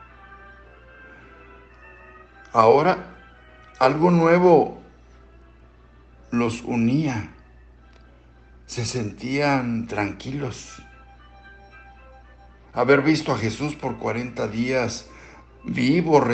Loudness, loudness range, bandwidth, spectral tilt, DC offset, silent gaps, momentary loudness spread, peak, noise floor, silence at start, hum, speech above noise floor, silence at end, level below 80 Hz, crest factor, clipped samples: -21 LUFS; 8 LU; 8.8 kHz; -6.5 dB/octave; under 0.1%; none; 18 LU; -2 dBFS; -50 dBFS; 0.3 s; none; 30 dB; 0 s; -50 dBFS; 22 dB; under 0.1%